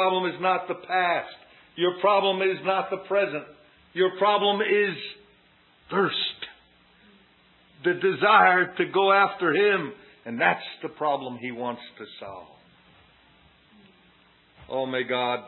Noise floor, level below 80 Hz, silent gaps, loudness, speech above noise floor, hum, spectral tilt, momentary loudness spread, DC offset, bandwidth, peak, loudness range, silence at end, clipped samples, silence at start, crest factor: -59 dBFS; -70 dBFS; none; -24 LUFS; 35 dB; none; -9 dB/octave; 19 LU; under 0.1%; 4.3 kHz; -4 dBFS; 13 LU; 0 s; under 0.1%; 0 s; 22 dB